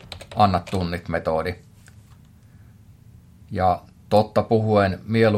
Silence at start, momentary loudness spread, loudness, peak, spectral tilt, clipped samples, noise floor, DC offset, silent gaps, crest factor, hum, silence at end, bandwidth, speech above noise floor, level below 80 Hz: 0.05 s; 11 LU; -22 LUFS; -4 dBFS; -7.5 dB/octave; under 0.1%; -49 dBFS; under 0.1%; none; 18 dB; none; 0 s; 15 kHz; 29 dB; -52 dBFS